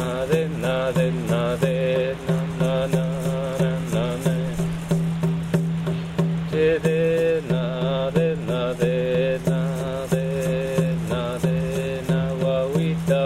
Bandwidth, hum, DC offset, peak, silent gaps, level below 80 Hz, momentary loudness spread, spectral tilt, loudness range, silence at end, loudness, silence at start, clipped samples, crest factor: 14 kHz; none; under 0.1%; -6 dBFS; none; -44 dBFS; 4 LU; -7 dB/octave; 2 LU; 0 s; -23 LUFS; 0 s; under 0.1%; 16 dB